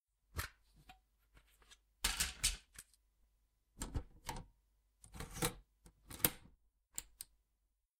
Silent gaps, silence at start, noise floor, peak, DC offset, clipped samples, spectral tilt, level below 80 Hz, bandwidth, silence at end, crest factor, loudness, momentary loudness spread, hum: none; 0.35 s; -84 dBFS; -10 dBFS; under 0.1%; under 0.1%; -2 dB/octave; -56 dBFS; 16 kHz; 0.75 s; 36 dB; -41 LUFS; 20 LU; none